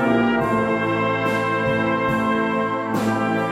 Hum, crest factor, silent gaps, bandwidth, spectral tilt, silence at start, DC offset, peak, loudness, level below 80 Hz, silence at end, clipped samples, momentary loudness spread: none; 14 dB; none; 15 kHz; -6.5 dB/octave; 0 s; under 0.1%; -8 dBFS; -20 LUFS; -50 dBFS; 0 s; under 0.1%; 3 LU